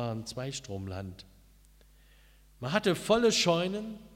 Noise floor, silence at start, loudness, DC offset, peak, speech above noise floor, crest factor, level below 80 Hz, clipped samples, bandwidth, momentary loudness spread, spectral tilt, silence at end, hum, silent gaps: -59 dBFS; 0 s; -30 LUFS; under 0.1%; -12 dBFS; 29 dB; 20 dB; -58 dBFS; under 0.1%; 16 kHz; 17 LU; -4 dB/octave; 0 s; none; none